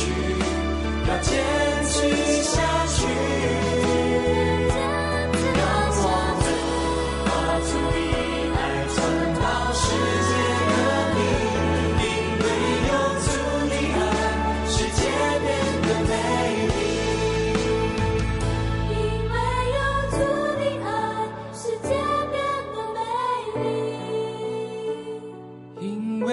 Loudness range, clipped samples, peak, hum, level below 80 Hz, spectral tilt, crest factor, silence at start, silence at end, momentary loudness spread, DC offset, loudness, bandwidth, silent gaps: 4 LU; under 0.1%; -10 dBFS; none; -34 dBFS; -5 dB/octave; 14 dB; 0 s; 0 s; 7 LU; under 0.1%; -23 LUFS; 11.5 kHz; none